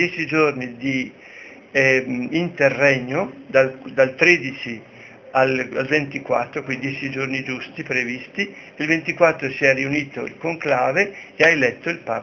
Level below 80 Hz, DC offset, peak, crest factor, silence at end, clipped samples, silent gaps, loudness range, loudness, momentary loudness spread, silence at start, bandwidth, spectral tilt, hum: -60 dBFS; under 0.1%; 0 dBFS; 20 dB; 0 s; under 0.1%; none; 5 LU; -20 LUFS; 12 LU; 0 s; 7 kHz; -5.5 dB/octave; none